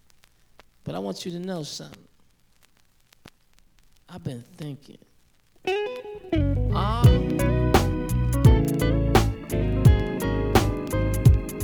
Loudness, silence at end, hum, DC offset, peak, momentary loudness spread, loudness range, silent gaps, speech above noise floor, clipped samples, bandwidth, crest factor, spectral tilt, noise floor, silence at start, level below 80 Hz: -23 LUFS; 0 s; none; under 0.1%; -4 dBFS; 18 LU; 20 LU; none; 35 dB; under 0.1%; over 20 kHz; 20 dB; -6.5 dB/octave; -59 dBFS; 0.85 s; -30 dBFS